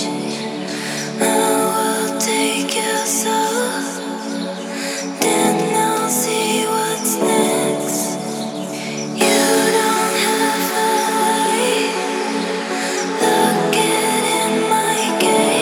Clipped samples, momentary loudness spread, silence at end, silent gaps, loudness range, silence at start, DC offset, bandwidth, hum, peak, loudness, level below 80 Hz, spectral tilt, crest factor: under 0.1%; 9 LU; 0 s; none; 3 LU; 0 s; under 0.1%; 20 kHz; none; -2 dBFS; -17 LUFS; -72 dBFS; -2.5 dB/octave; 16 dB